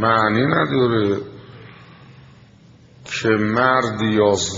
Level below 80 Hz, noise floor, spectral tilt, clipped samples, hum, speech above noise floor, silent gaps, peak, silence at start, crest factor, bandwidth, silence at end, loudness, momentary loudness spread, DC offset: -54 dBFS; -48 dBFS; -4.5 dB/octave; under 0.1%; none; 30 dB; none; -2 dBFS; 0 s; 18 dB; 7.8 kHz; 0 s; -18 LUFS; 11 LU; under 0.1%